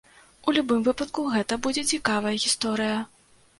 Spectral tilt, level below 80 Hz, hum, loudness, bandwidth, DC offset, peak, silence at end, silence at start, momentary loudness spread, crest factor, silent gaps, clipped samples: -3 dB/octave; -58 dBFS; none; -25 LUFS; 11.5 kHz; under 0.1%; -6 dBFS; 0.55 s; 0.45 s; 5 LU; 20 dB; none; under 0.1%